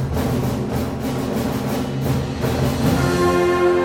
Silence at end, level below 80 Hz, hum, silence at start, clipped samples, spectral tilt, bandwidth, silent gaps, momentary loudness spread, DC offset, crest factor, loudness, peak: 0 s; -36 dBFS; none; 0 s; under 0.1%; -6.5 dB/octave; 17 kHz; none; 7 LU; under 0.1%; 14 dB; -20 LUFS; -6 dBFS